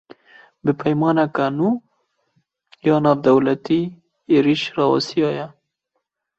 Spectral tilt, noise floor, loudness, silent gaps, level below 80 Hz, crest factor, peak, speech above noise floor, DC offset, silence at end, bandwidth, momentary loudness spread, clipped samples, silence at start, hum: -7 dB/octave; -76 dBFS; -19 LUFS; none; -62 dBFS; 18 dB; -2 dBFS; 58 dB; under 0.1%; 0.9 s; 8 kHz; 9 LU; under 0.1%; 0.65 s; none